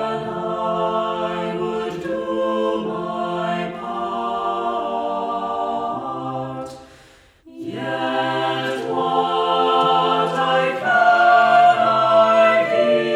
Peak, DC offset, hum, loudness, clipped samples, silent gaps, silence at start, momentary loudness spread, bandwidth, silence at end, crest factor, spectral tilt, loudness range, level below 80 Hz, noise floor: -4 dBFS; under 0.1%; none; -19 LUFS; under 0.1%; none; 0 s; 13 LU; 10.5 kHz; 0 s; 16 dB; -5.5 dB/octave; 10 LU; -58 dBFS; -50 dBFS